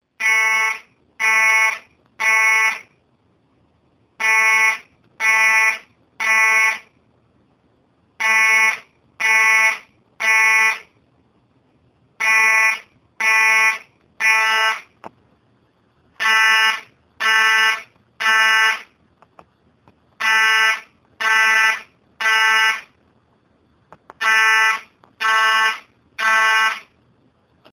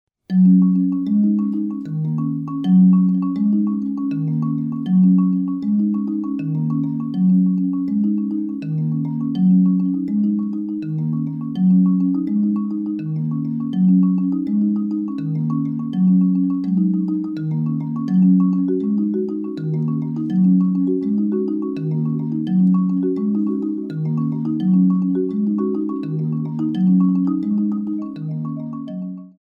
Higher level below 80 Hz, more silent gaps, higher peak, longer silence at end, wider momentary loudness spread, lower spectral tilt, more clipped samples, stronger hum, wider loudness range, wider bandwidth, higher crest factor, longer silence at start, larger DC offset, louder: second, -72 dBFS vs -66 dBFS; neither; first, 0 dBFS vs -6 dBFS; first, 0.95 s vs 0.1 s; first, 14 LU vs 9 LU; second, 2.5 dB/octave vs -12 dB/octave; neither; neither; about the same, 2 LU vs 2 LU; first, 19.5 kHz vs 3.3 kHz; first, 18 dB vs 12 dB; about the same, 0.2 s vs 0.3 s; neither; first, -15 LUFS vs -19 LUFS